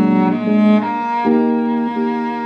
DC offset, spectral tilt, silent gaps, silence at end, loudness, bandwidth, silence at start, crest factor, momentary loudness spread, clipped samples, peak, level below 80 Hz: under 0.1%; -9 dB/octave; none; 0 s; -16 LUFS; 5.4 kHz; 0 s; 12 dB; 6 LU; under 0.1%; -4 dBFS; -66 dBFS